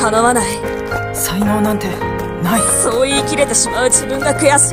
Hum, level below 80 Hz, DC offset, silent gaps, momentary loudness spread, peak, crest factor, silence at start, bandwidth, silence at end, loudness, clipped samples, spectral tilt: none; -36 dBFS; under 0.1%; none; 9 LU; 0 dBFS; 14 dB; 0 s; 16 kHz; 0 s; -14 LUFS; under 0.1%; -3 dB/octave